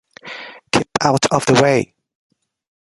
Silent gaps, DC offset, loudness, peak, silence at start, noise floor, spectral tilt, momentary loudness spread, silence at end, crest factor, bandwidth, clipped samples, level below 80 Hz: none; under 0.1%; -16 LUFS; 0 dBFS; 0.25 s; -35 dBFS; -4.5 dB/octave; 19 LU; 1 s; 18 dB; 11.5 kHz; under 0.1%; -50 dBFS